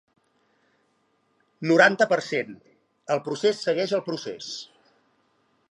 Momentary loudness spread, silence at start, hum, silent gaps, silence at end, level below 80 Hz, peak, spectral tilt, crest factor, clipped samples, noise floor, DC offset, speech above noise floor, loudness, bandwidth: 19 LU; 1.6 s; none; none; 1.05 s; -80 dBFS; -4 dBFS; -4.5 dB/octave; 24 dB; under 0.1%; -69 dBFS; under 0.1%; 45 dB; -24 LUFS; 11.5 kHz